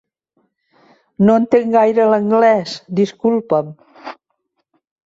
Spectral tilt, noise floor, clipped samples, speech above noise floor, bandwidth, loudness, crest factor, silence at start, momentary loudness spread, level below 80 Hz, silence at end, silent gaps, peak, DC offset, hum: -7 dB/octave; -70 dBFS; under 0.1%; 56 dB; 7.8 kHz; -15 LUFS; 14 dB; 1.2 s; 22 LU; -60 dBFS; 0.95 s; none; -2 dBFS; under 0.1%; none